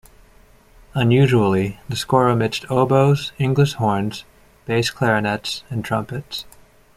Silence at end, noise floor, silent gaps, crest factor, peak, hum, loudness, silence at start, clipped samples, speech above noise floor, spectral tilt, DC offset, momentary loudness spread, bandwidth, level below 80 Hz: 0.45 s; -50 dBFS; none; 18 dB; -2 dBFS; none; -19 LUFS; 0.95 s; under 0.1%; 32 dB; -6 dB/octave; under 0.1%; 13 LU; 15.5 kHz; -48 dBFS